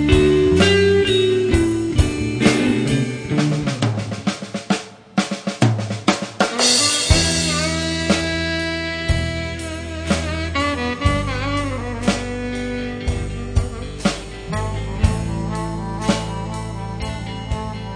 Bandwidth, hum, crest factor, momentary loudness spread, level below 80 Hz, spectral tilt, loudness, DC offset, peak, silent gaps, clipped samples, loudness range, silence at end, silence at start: 10.5 kHz; none; 20 dB; 12 LU; -30 dBFS; -4.5 dB/octave; -20 LUFS; under 0.1%; 0 dBFS; none; under 0.1%; 7 LU; 0 s; 0 s